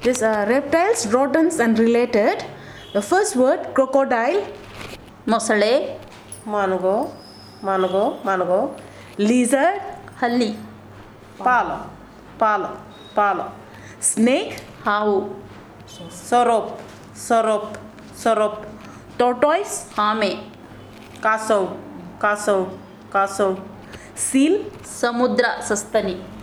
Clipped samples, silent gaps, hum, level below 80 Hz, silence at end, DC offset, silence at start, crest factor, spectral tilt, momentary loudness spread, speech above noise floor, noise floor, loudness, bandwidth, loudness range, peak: under 0.1%; none; none; -56 dBFS; 0 s; under 0.1%; 0 s; 18 dB; -4 dB/octave; 20 LU; 22 dB; -42 dBFS; -20 LUFS; 17.5 kHz; 4 LU; -2 dBFS